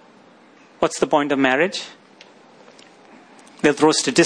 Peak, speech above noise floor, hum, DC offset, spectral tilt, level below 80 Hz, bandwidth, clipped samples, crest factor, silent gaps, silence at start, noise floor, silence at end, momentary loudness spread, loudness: -2 dBFS; 32 dB; none; under 0.1%; -3.5 dB/octave; -60 dBFS; 10.5 kHz; under 0.1%; 20 dB; none; 0.8 s; -49 dBFS; 0 s; 9 LU; -19 LUFS